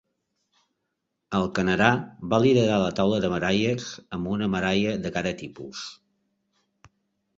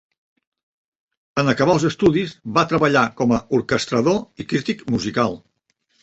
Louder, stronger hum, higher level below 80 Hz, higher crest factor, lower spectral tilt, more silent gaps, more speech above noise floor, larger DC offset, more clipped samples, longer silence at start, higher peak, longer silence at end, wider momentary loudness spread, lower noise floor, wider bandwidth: second, -24 LUFS vs -19 LUFS; neither; about the same, -52 dBFS vs -50 dBFS; first, 24 dB vs 18 dB; about the same, -6 dB/octave vs -6 dB/octave; neither; first, 56 dB vs 49 dB; neither; neither; about the same, 1.3 s vs 1.35 s; about the same, -2 dBFS vs -2 dBFS; first, 1.45 s vs 0.65 s; first, 16 LU vs 7 LU; first, -80 dBFS vs -68 dBFS; about the same, 7.8 kHz vs 8.4 kHz